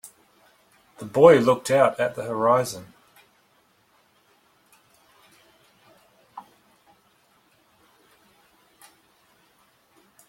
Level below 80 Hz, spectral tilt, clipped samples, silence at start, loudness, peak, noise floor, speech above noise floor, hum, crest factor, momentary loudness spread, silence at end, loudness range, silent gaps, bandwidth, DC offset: -68 dBFS; -5.5 dB/octave; under 0.1%; 1 s; -20 LUFS; 0 dBFS; -63 dBFS; 44 dB; none; 26 dB; 31 LU; 3.9 s; 9 LU; none; 16.5 kHz; under 0.1%